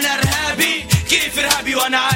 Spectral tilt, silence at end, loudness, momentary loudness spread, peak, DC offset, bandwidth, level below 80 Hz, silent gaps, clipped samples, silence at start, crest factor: -2.5 dB/octave; 0 s; -16 LUFS; 2 LU; 0 dBFS; under 0.1%; 16.5 kHz; -36 dBFS; none; under 0.1%; 0 s; 16 dB